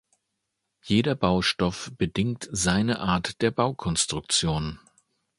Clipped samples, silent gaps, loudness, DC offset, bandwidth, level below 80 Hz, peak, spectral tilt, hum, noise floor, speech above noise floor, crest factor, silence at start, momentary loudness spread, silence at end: under 0.1%; none; -25 LUFS; under 0.1%; 11.5 kHz; -46 dBFS; -6 dBFS; -4 dB/octave; none; -80 dBFS; 55 dB; 20 dB; 0.85 s; 6 LU; 0.6 s